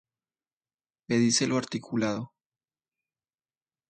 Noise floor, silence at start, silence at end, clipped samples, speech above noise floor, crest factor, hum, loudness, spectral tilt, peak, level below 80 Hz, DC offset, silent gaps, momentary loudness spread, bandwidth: under -90 dBFS; 1.1 s; 1.65 s; under 0.1%; over 63 dB; 20 dB; none; -27 LUFS; -4 dB/octave; -12 dBFS; -70 dBFS; under 0.1%; none; 11 LU; 9.4 kHz